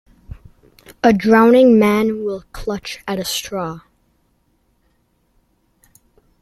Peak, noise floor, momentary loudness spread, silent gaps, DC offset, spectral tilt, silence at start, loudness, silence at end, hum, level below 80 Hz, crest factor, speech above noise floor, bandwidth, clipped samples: 0 dBFS; -62 dBFS; 16 LU; none; under 0.1%; -5 dB/octave; 0.3 s; -16 LUFS; 2.6 s; none; -46 dBFS; 18 dB; 47 dB; 14.5 kHz; under 0.1%